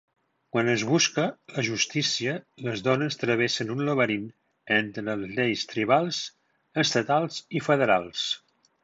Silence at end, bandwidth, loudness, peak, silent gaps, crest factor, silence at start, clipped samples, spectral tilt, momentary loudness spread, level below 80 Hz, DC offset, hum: 0.45 s; 8 kHz; -26 LUFS; -8 dBFS; none; 20 dB; 0.55 s; under 0.1%; -4 dB/octave; 9 LU; -68 dBFS; under 0.1%; none